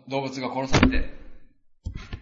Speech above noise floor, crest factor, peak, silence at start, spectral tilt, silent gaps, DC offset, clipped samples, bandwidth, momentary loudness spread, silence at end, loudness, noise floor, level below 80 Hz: 25 dB; 22 dB; -4 dBFS; 0.05 s; -5.5 dB/octave; none; under 0.1%; under 0.1%; 7.8 kHz; 19 LU; 0 s; -24 LUFS; -48 dBFS; -32 dBFS